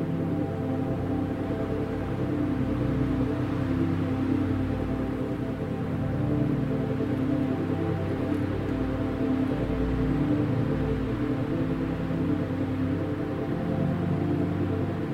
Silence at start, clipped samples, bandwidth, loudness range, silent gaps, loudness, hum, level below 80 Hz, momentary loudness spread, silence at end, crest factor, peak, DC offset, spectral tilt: 0 s; under 0.1%; 11 kHz; 1 LU; none; -28 LUFS; none; -42 dBFS; 3 LU; 0 s; 14 dB; -12 dBFS; under 0.1%; -9 dB/octave